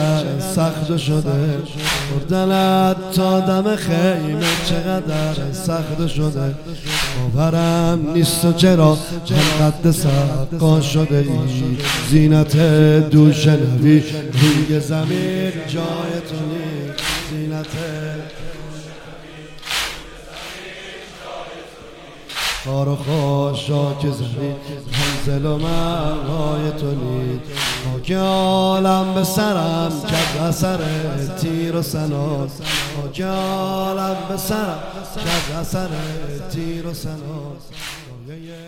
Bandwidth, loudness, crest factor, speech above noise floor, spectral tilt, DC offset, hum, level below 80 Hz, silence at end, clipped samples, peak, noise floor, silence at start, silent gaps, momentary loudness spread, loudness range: 16.5 kHz; -18 LUFS; 18 dB; 20 dB; -5.5 dB/octave; under 0.1%; none; -36 dBFS; 0 s; under 0.1%; 0 dBFS; -38 dBFS; 0 s; none; 17 LU; 12 LU